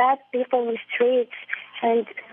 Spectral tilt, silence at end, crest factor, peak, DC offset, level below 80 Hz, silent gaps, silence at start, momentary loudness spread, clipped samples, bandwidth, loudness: -7.5 dB/octave; 0.1 s; 14 dB; -8 dBFS; under 0.1%; -88 dBFS; none; 0 s; 9 LU; under 0.1%; 3.8 kHz; -24 LUFS